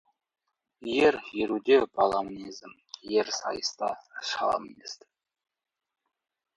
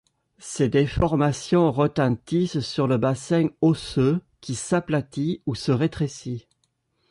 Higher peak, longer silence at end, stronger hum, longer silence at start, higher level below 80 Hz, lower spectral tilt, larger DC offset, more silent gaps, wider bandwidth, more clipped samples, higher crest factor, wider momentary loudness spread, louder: about the same, -10 dBFS vs -8 dBFS; first, 1.6 s vs 0.7 s; neither; first, 0.8 s vs 0.4 s; second, -66 dBFS vs -46 dBFS; second, -3 dB/octave vs -6.5 dB/octave; neither; neither; second, 9.2 kHz vs 11.5 kHz; neither; about the same, 20 dB vs 16 dB; first, 20 LU vs 10 LU; second, -28 LUFS vs -23 LUFS